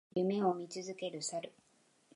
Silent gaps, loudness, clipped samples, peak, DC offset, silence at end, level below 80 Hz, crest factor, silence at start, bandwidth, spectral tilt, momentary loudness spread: none; -37 LUFS; under 0.1%; -20 dBFS; under 0.1%; 0.65 s; -84 dBFS; 18 dB; 0.15 s; 11.5 kHz; -5 dB/octave; 11 LU